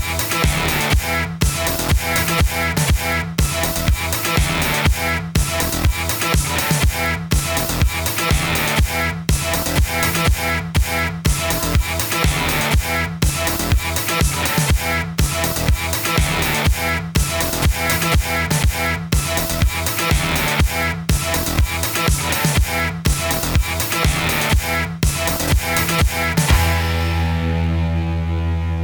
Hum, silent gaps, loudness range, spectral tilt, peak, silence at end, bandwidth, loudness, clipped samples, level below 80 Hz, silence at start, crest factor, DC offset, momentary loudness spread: none; none; 1 LU; -4 dB/octave; -2 dBFS; 0 s; over 20 kHz; -18 LUFS; under 0.1%; -24 dBFS; 0 s; 16 dB; under 0.1%; 3 LU